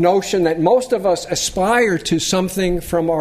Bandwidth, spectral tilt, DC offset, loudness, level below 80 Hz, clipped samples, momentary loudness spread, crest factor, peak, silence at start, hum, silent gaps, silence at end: 15.5 kHz; -4 dB/octave; under 0.1%; -17 LUFS; -38 dBFS; under 0.1%; 4 LU; 16 dB; -2 dBFS; 0 s; none; none; 0 s